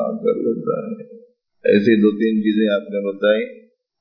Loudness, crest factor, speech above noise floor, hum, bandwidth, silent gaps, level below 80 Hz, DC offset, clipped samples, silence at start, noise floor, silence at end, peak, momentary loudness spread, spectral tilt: -18 LUFS; 16 dB; 29 dB; none; 5.4 kHz; none; -76 dBFS; under 0.1%; under 0.1%; 0 s; -47 dBFS; 0.4 s; -4 dBFS; 11 LU; -8.5 dB/octave